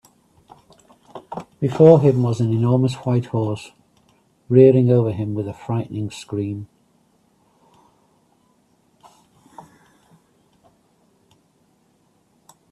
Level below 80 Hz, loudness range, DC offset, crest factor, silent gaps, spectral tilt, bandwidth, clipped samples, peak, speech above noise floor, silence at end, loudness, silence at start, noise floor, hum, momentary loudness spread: -58 dBFS; 14 LU; under 0.1%; 22 dB; none; -9 dB/octave; 11 kHz; under 0.1%; 0 dBFS; 45 dB; 6.05 s; -18 LUFS; 1.15 s; -61 dBFS; none; 21 LU